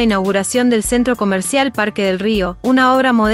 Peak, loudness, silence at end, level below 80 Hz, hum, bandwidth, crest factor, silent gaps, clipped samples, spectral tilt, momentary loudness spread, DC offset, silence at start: -2 dBFS; -15 LUFS; 0 s; -38 dBFS; none; 15.5 kHz; 12 dB; none; under 0.1%; -4 dB/octave; 5 LU; under 0.1%; 0 s